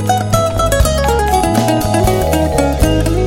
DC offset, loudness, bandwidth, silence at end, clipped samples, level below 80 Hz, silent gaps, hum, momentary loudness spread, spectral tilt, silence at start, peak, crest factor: under 0.1%; -13 LUFS; 17 kHz; 0 s; under 0.1%; -20 dBFS; none; none; 1 LU; -5.5 dB/octave; 0 s; 0 dBFS; 12 dB